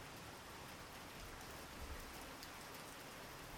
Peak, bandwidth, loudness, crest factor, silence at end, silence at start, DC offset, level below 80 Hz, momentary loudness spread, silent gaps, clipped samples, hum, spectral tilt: -34 dBFS; 19 kHz; -52 LUFS; 18 dB; 0 s; 0 s; under 0.1%; -62 dBFS; 2 LU; none; under 0.1%; none; -3 dB/octave